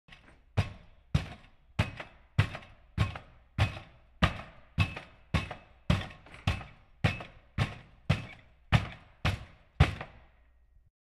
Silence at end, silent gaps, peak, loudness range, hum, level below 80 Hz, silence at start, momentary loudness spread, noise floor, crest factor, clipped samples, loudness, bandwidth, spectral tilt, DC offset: 1.05 s; none; -10 dBFS; 2 LU; none; -42 dBFS; 0.1 s; 17 LU; -62 dBFS; 24 dB; under 0.1%; -34 LUFS; 12.5 kHz; -6 dB/octave; under 0.1%